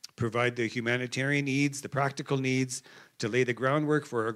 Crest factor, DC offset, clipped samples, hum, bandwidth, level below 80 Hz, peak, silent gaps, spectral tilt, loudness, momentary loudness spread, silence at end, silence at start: 16 dB; under 0.1%; under 0.1%; none; 14 kHz; -74 dBFS; -14 dBFS; none; -5 dB/octave; -29 LUFS; 4 LU; 0 s; 0.05 s